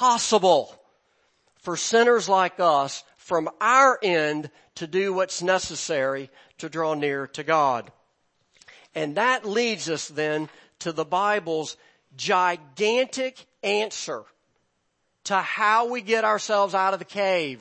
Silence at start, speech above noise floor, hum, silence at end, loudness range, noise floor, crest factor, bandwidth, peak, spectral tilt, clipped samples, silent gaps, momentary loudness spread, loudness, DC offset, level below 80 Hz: 0 s; 50 dB; none; 0.05 s; 5 LU; -73 dBFS; 20 dB; 8.8 kHz; -4 dBFS; -3 dB/octave; under 0.1%; none; 15 LU; -23 LUFS; under 0.1%; -70 dBFS